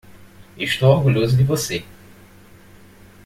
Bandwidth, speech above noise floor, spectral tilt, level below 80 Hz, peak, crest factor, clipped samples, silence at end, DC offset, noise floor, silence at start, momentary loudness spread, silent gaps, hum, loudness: 15.5 kHz; 29 dB; -5.5 dB/octave; -48 dBFS; -2 dBFS; 18 dB; under 0.1%; 1.4 s; under 0.1%; -46 dBFS; 0.1 s; 12 LU; none; none; -18 LUFS